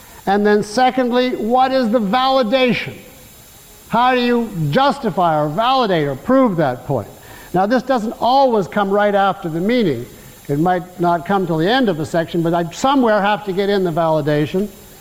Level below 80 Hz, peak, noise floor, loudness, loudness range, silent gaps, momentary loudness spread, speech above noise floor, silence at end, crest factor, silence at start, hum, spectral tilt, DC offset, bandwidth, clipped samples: -48 dBFS; -4 dBFS; -42 dBFS; -16 LUFS; 2 LU; none; 7 LU; 26 dB; 0.05 s; 12 dB; 0 s; none; -6 dB/octave; 0.3%; 17 kHz; under 0.1%